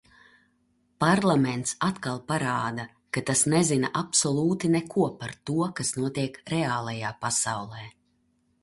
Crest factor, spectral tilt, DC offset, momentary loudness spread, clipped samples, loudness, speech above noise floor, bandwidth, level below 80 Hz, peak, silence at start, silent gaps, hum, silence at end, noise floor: 18 dB; -4 dB/octave; under 0.1%; 11 LU; under 0.1%; -26 LUFS; 43 dB; 11.5 kHz; -62 dBFS; -8 dBFS; 1 s; none; none; 0.7 s; -69 dBFS